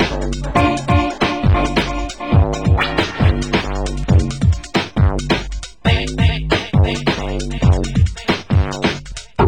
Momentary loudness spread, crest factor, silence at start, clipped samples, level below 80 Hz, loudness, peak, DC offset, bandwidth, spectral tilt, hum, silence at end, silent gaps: 6 LU; 16 dB; 0 s; under 0.1%; -22 dBFS; -17 LUFS; 0 dBFS; 0.7%; 16 kHz; -6 dB/octave; none; 0 s; none